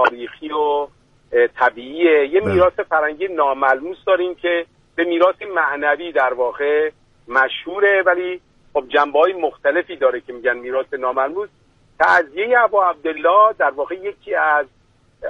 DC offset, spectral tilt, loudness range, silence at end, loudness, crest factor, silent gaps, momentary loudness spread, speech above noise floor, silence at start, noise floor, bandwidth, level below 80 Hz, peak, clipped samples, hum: under 0.1%; -6 dB/octave; 3 LU; 0 s; -18 LUFS; 16 dB; none; 10 LU; 20 dB; 0 s; -37 dBFS; 7.4 kHz; -54 dBFS; -2 dBFS; under 0.1%; none